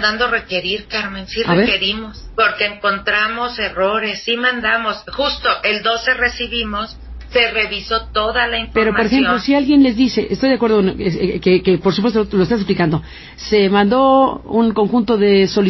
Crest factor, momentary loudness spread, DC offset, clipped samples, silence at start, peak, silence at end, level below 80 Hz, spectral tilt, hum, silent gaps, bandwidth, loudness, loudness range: 14 dB; 8 LU; under 0.1%; under 0.1%; 0 s; -2 dBFS; 0 s; -38 dBFS; -6 dB/octave; none; none; 6.2 kHz; -16 LUFS; 2 LU